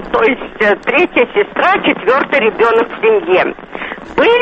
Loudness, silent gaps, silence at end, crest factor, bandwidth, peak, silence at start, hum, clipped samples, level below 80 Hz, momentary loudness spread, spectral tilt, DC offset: -12 LUFS; none; 0 s; 12 dB; 7.2 kHz; 0 dBFS; 0 s; none; under 0.1%; -44 dBFS; 8 LU; -6 dB/octave; under 0.1%